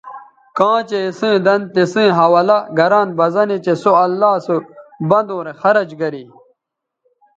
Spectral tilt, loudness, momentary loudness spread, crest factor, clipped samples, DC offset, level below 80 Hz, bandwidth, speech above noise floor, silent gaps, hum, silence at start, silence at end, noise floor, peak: -6.5 dB/octave; -15 LUFS; 11 LU; 16 dB; under 0.1%; under 0.1%; -66 dBFS; 7.8 kHz; 65 dB; none; none; 0.05 s; 1.15 s; -79 dBFS; 0 dBFS